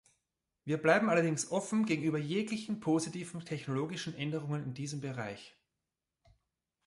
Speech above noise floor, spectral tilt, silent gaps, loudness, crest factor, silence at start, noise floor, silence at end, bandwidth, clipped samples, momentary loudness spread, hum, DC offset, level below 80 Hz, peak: 55 dB; -5.5 dB/octave; none; -34 LUFS; 22 dB; 0.65 s; -89 dBFS; 1.35 s; 11.5 kHz; under 0.1%; 12 LU; none; under 0.1%; -74 dBFS; -12 dBFS